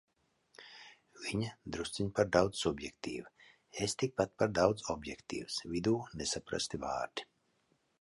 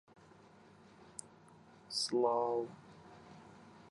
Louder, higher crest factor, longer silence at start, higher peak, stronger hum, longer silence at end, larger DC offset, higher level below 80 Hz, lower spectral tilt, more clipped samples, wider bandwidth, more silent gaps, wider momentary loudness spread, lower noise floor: about the same, -36 LUFS vs -36 LUFS; about the same, 24 dB vs 22 dB; second, 0.6 s vs 1 s; first, -12 dBFS vs -20 dBFS; neither; first, 0.8 s vs 0 s; neither; first, -60 dBFS vs -80 dBFS; about the same, -4.5 dB/octave vs -3.5 dB/octave; neither; about the same, 11.5 kHz vs 11.5 kHz; neither; second, 16 LU vs 25 LU; first, -76 dBFS vs -61 dBFS